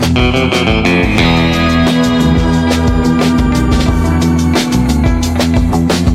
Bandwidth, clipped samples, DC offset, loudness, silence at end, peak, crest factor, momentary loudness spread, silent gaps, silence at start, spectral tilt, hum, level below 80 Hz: 15.5 kHz; under 0.1%; under 0.1%; -11 LUFS; 0 s; -2 dBFS; 10 dB; 2 LU; none; 0 s; -6 dB/octave; none; -18 dBFS